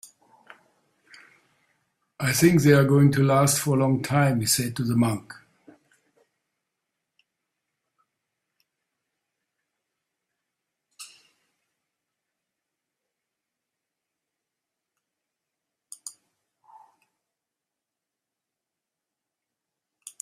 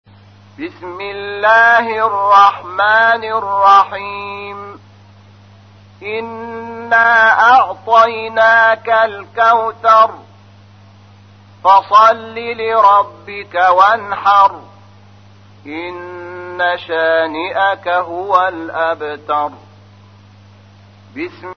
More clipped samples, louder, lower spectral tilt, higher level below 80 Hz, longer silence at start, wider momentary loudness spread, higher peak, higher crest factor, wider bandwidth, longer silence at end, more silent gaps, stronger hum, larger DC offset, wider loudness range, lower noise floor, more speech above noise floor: neither; second, -21 LUFS vs -12 LUFS; first, -5.5 dB/octave vs -4 dB/octave; about the same, -62 dBFS vs -60 dBFS; first, 2.2 s vs 0.6 s; first, 25 LU vs 18 LU; second, -4 dBFS vs 0 dBFS; first, 24 dB vs 14 dB; first, 15.5 kHz vs 6.6 kHz; first, 4.15 s vs 0.05 s; neither; neither; second, under 0.1% vs 0.1%; first, 11 LU vs 8 LU; first, -87 dBFS vs -42 dBFS; first, 67 dB vs 30 dB